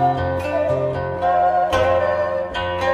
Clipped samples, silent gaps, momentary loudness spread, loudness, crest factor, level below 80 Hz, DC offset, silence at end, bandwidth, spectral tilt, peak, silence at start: under 0.1%; none; 6 LU; -19 LUFS; 12 dB; -42 dBFS; under 0.1%; 0 s; 13 kHz; -6 dB/octave; -6 dBFS; 0 s